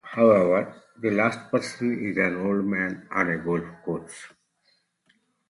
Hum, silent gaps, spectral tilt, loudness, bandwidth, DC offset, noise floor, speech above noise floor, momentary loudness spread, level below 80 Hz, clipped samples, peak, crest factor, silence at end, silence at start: none; none; -6.5 dB/octave; -25 LUFS; 11.5 kHz; under 0.1%; -68 dBFS; 44 dB; 14 LU; -62 dBFS; under 0.1%; -6 dBFS; 20 dB; 1.2 s; 0.05 s